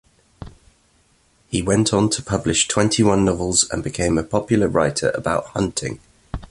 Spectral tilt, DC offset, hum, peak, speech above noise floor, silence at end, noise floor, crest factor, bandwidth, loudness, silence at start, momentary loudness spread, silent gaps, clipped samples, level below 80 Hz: -4 dB/octave; under 0.1%; none; -2 dBFS; 40 dB; 0.05 s; -59 dBFS; 18 dB; 11.5 kHz; -19 LUFS; 0.4 s; 10 LU; none; under 0.1%; -40 dBFS